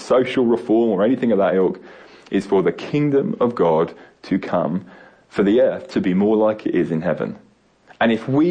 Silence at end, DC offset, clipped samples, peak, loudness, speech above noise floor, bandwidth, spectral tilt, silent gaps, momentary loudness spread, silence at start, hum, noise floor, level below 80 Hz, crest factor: 0 s; under 0.1%; under 0.1%; -6 dBFS; -19 LUFS; 33 dB; 9.6 kHz; -8 dB/octave; none; 8 LU; 0 s; none; -51 dBFS; -56 dBFS; 12 dB